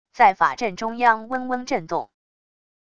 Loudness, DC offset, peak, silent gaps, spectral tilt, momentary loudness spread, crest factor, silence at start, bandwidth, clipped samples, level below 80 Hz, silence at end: -22 LUFS; 0.5%; -2 dBFS; none; -4 dB/octave; 12 LU; 20 dB; 0.15 s; 8 kHz; under 0.1%; -60 dBFS; 0.8 s